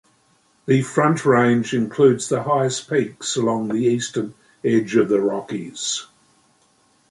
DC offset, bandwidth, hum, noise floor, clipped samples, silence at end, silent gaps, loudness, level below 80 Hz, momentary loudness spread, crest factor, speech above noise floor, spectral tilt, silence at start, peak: under 0.1%; 11.5 kHz; none; -60 dBFS; under 0.1%; 1.05 s; none; -20 LUFS; -64 dBFS; 11 LU; 18 dB; 41 dB; -5 dB/octave; 0.65 s; -2 dBFS